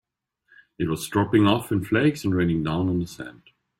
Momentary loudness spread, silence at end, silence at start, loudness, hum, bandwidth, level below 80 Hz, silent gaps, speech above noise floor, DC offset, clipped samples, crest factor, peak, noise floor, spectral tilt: 12 LU; 0.5 s; 0.8 s; -23 LUFS; none; 16 kHz; -52 dBFS; none; 43 dB; under 0.1%; under 0.1%; 20 dB; -6 dBFS; -66 dBFS; -6.5 dB/octave